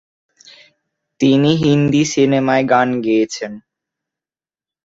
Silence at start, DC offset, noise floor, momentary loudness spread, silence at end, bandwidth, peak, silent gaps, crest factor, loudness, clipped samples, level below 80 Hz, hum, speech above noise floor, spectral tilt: 1.2 s; under 0.1%; under -90 dBFS; 7 LU; 1.25 s; 7.8 kHz; -2 dBFS; none; 16 dB; -15 LUFS; under 0.1%; -54 dBFS; none; over 76 dB; -6 dB/octave